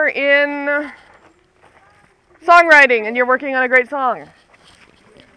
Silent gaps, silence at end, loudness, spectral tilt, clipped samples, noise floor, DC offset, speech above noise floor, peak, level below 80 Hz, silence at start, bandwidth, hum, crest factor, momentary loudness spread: none; 1.15 s; -13 LUFS; -3 dB/octave; under 0.1%; -52 dBFS; under 0.1%; 38 dB; 0 dBFS; -60 dBFS; 0 s; 11 kHz; none; 16 dB; 14 LU